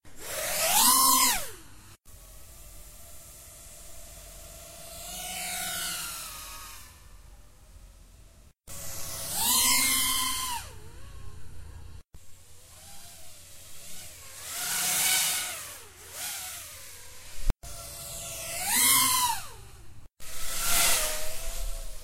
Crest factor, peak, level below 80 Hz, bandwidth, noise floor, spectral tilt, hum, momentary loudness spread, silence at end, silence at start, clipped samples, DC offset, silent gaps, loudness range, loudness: 24 dB; -8 dBFS; -44 dBFS; 16 kHz; -54 dBFS; 0 dB/octave; none; 27 LU; 0 s; 0.05 s; under 0.1%; under 0.1%; none; 19 LU; -26 LUFS